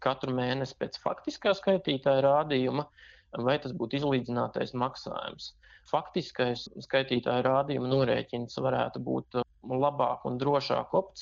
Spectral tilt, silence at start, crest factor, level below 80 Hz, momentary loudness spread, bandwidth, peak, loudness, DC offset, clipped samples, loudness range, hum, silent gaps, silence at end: -6.5 dB/octave; 0 s; 20 dB; -64 dBFS; 9 LU; 7.4 kHz; -10 dBFS; -30 LUFS; under 0.1%; under 0.1%; 4 LU; none; none; 0 s